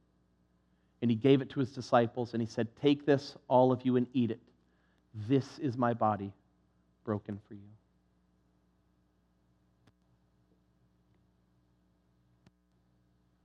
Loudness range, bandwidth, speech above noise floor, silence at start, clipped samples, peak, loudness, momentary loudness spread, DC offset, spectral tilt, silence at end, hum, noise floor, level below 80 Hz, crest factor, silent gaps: 16 LU; 8.4 kHz; 41 dB; 1 s; under 0.1%; -12 dBFS; -31 LUFS; 17 LU; under 0.1%; -7.5 dB/octave; 5.8 s; 60 Hz at -65 dBFS; -72 dBFS; -76 dBFS; 24 dB; none